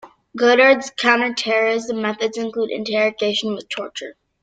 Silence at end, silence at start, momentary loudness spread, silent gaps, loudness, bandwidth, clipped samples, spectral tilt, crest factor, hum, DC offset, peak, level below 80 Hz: 0.3 s; 0.05 s; 15 LU; none; -18 LUFS; 9.2 kHz; under 0.1%; -3 dB/octave; 18 dB; none; under 0.1%; -2 dBFS; -66 dBFS